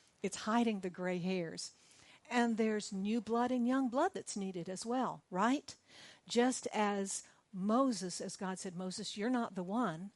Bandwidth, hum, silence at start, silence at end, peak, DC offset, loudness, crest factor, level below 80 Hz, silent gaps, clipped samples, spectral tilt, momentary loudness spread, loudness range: 11.5 kHz; none; 0.25 s; 0.05 s; -20 dBFS; under 0.1%; -37 LUFS; 16 dB; -82 dBFS; none; under 0.1%; -4.5 dB/octave; 9 LU; 1 LU